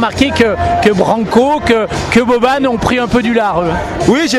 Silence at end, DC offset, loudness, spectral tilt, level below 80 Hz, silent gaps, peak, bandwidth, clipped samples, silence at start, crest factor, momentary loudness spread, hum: 0 s; under 0.1%; -12 LUFS; -5 dB/octave; -32 dBFS; none; 0 dBFS; 14 kHz; 0.3%; 0 s; 12 dB; 3 LU; none